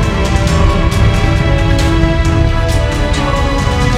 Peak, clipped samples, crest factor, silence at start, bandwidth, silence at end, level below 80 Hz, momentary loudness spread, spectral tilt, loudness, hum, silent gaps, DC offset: 0 dBFS; under 0.1%; 10 dB; 0 s; 14.5 kHz; 0 s; -14 dBFS; 2 LU; -6 dB/octave; -13 LUFS; none; none; under 0.1%